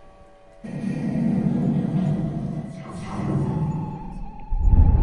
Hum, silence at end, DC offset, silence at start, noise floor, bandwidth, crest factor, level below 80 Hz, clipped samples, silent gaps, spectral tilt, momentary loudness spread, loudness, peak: none; 0 s; under 0.1%; 0 s; -48 dBFS; 10 kHz; 18 dB; -26 dBFS; under 0.1%; none; -9.5 dB/octave; 14 LU; -25 LUFS; -4 dBFS